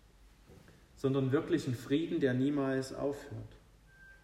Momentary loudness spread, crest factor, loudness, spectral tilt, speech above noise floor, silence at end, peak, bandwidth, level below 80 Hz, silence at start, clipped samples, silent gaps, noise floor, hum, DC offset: 14 LU; 18 dB; -34 LUFS; -7 dB/octave; 28 dB; 0.1 s; -18 dBFS; 14.5 kHz; -62 dBFS; 0.5 s; under 0.1%; none; -61 dBFS; none; under 0.1%